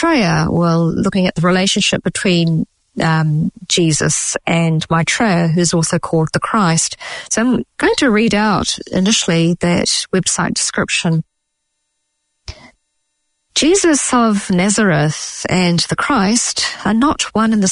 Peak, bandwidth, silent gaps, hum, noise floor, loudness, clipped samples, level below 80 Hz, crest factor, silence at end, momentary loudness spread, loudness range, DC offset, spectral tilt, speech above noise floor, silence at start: -2 dBFS; 11 kHz; none; none; -71 dBFS; -14 LUFS; under 0.1%; -44 dBFS; 14 dB; 0 s; 5 LU; 4 LU; under 0.1%; -4 dB/octave; 57 dB; 0 s